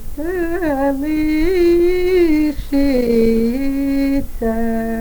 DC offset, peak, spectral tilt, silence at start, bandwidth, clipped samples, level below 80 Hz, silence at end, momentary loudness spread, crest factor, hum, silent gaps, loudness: under 0.1%; -4 dBFS; -6.5 dB/octave; 0 s; over 20 kHz; under 0.1%; -26 dBFS; 0 s; 6 LU; 12 dB; none; none; -17 LUFS